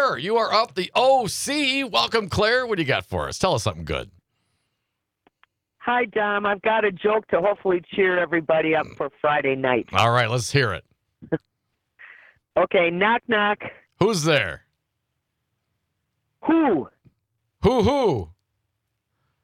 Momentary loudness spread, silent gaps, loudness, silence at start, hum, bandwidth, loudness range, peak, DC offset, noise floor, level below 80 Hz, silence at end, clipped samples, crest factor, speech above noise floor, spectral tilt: 11 LU; none; -22 LUFS; 0 s; none; 16 kHz; 5 LU; -4 dBFS; under 0.1%; -79 dBFS; -52 dBFS; 1.15 s; under 0.1%; 20 dB; 58 dB; -4.5 dB/octave